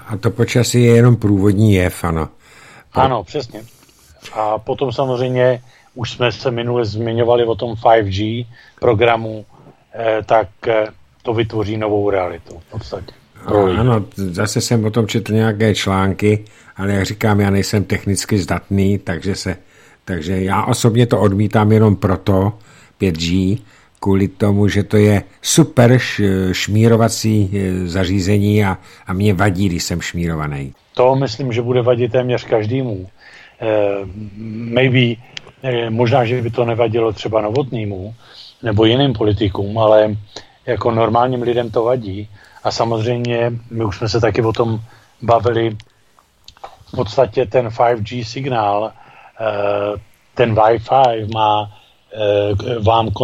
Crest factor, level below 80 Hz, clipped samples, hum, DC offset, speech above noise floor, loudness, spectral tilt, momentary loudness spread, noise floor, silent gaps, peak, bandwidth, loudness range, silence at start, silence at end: 16 dB; -44 dBFS; under 0.1%; none; under 0.1%; 38 dB; -16 LUFS; -6 dB/octave; 13 LU; -54 dBFS; none; 0 dBFS; 15.5 kHz; 4 LU; 0 s; 0 s